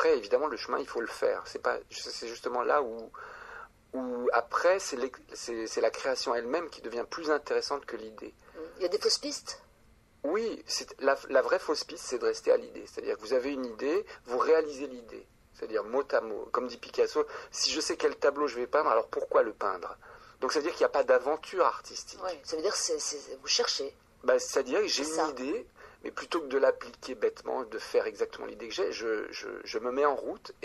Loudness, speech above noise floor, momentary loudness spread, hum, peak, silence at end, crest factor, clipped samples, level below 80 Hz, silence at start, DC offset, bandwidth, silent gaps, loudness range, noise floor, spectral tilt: -31 LUFS; 31 dB; 14 LU; none; -10 dBFS; 0.1 s; 20 dB; under 0.1%; -66 dBFS; 0 s; under 0.1%; 13 kHz; none; 4 LU; -62 dBFS; -1.5 dB/octave